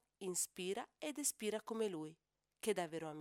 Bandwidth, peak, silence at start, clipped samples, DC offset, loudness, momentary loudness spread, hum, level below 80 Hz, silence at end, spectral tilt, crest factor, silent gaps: 19 kHz; -24 dBFS; 0.2 s; under 0.1%; under 0.1%; -42 LUFS; 6 LU; none; -86 dBFS; 0 s; -3 dB/octave; 20 dB; none